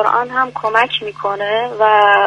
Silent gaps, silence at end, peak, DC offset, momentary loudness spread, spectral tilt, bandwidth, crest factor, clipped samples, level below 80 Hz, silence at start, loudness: none; 0 s; 0 dBFS; under 0.1%; 9 LU; -4 dB/octave; 9.6 kHz; 14 dB; under 0.1%; -60 dBFS; 0 s; -15 LUFS